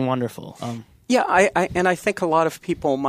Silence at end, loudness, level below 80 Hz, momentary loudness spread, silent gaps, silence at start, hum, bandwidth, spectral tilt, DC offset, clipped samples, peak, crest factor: 0 s; -21 LUFS; -52 dBFS; 15 LU; none; 0 s; none; 15.5 kHz; -5 dB/octave; under 0.1%; under 0.1%; -2 dBFS; 18 dB